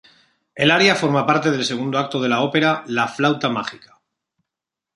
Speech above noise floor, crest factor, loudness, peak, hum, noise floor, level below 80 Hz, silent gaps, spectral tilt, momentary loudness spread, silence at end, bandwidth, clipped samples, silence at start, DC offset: 67 dB; 18 dB; -18 LUFS; -2 dBFS; none; -86 dBFS; -64 dBFS; none; -4.5 dB/octave; 8 LU; 1.2 s; 11.5 kHz; under 0.1%; 0.55 s; under 0.1%